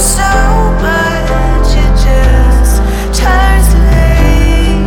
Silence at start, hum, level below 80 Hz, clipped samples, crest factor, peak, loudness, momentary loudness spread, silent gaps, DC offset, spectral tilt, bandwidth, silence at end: 0 s; none; -8 dBFS; under 0.1%; 6 dB; 0 dBFS; -10 LUFS; 4 LU; none; under 0.1%; -5 dB/octave; 17 kHz; 0 s